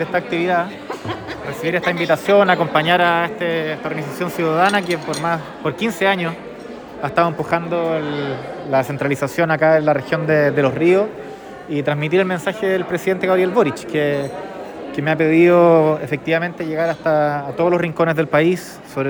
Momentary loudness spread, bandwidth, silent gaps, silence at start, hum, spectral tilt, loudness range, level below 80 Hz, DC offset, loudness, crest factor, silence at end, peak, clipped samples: 13 LU; over 20 kHz; none; 0 s; none; -6 dB/octave; 4 LU; -56 dBFS; under 0.1%; -18 LUFS; 16 dB; 0 s; -2 dBFS; under 0.1%